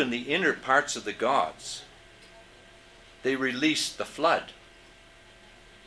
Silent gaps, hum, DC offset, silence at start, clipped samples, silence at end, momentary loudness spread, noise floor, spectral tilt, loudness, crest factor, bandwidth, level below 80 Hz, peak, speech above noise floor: none; none; under 0.1%; 0 s; under 0.1%; 1.35 s; 12 LU; -53 dBFS; -2.5 dB/octave; -27 LUFS; 22 dB; 11 kHz; -62 dBFS; -8 dBFS; 26 dB